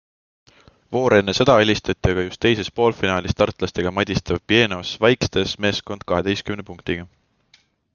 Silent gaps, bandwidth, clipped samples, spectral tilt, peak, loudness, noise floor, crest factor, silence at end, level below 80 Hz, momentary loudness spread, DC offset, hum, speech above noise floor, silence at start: none; 7.2 kHz; under 0.1%; -5 dB/octave; 0 dBFS; -20 LUFS; -59 dBFS; 20 dB; 0.9 s; -44 dBFS; 11 LU; under 0.1%; none; 39 dB; 0.9 s